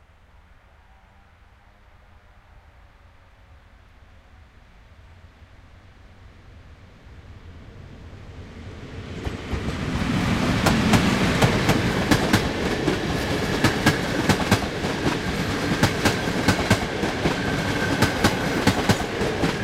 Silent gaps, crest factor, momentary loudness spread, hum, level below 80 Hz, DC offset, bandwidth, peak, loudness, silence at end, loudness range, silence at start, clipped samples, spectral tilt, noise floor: none; 22 dB; 20 LU; none; -38 dBFS; under 0.1%; 16 kHz; -2 dBFS; -22 LUFS; 0 s; 15 LU; 2.55 s; under 0.1%; -5 dB/octave; -52 dBFS